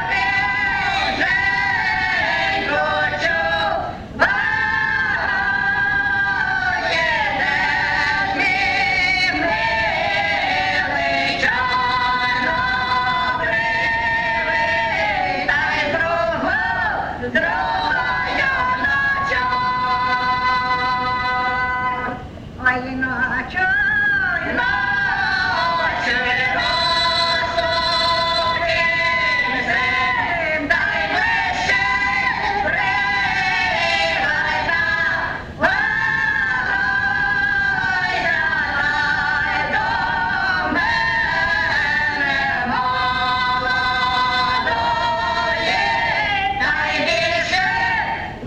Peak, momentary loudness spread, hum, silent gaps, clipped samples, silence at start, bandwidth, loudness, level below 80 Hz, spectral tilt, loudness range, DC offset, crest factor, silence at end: -2 dBFS; 3 LU; none; none; under 0.1%; 0 s; 11.5 kHz; -18 LUFS; -40 dBFS; -3.5 dB/octave; 2 LU; under 0.1%; 16 dB; 0 s